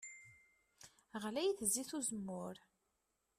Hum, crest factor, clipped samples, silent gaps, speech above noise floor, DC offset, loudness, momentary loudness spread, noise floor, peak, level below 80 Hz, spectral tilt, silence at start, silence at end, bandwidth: none; 24 dB; under 0.1%; none; 44 dB; under 0.1%; -41 LUFS; 24 LU; -85 dBFS; -20 dBFS; -78 dBFS; -3 dB/octave; 0 s; 0.8 s; 14.5 kHz